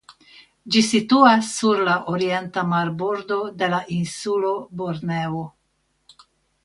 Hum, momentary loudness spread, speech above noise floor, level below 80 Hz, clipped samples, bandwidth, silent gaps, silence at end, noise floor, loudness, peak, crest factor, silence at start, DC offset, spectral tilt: none; 13 LU; 48 dB; -62 dBFS; under 0.1%; 11.5 kHz; none; 1.15 s; -69 dBFS; -21 LUFS; -2 dBFS; 20 dB; 0.1 s; under 0.1%; -4.5 dB/octave